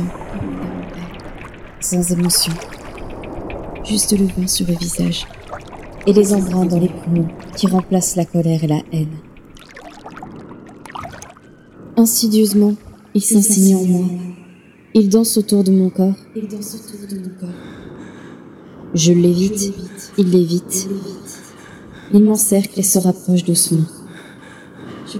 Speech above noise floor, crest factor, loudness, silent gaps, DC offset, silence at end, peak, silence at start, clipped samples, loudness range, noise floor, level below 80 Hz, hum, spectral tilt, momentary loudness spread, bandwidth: 29 dB; 16 dB; -16 LUFS; none; under 0.1%; 0 s; 0 dBFS; 0 s; under 0.1%; 6 LU; -44 dBFS; -42 dBFS; none; -5 dB/octave; 23 LU; 17.5 kHz